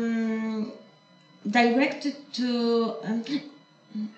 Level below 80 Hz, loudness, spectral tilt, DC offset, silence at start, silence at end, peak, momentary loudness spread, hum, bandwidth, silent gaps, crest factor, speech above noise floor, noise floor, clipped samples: -84 dBFS; -27 LUFS; -5.5 dB/octave; under 0.1%; 0 s; 0.05 s; -8 dBFS; 15 LU; none; 8.2 kHz; none; 18 dB; 31 dB; -56 dBFS; under 0.1%